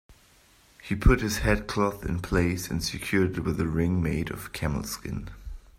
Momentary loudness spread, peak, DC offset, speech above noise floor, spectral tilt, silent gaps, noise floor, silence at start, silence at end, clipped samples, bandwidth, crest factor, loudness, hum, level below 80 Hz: 11 LU; -8 dBFS; under 0.1%; 32 dB; -5.5 dB/octave; none; -59 dBFS; 0.1 s; 0.2 s; under 0.1%; 16 kHz; 20 dB; -28 LUFS; none; -34 dBFS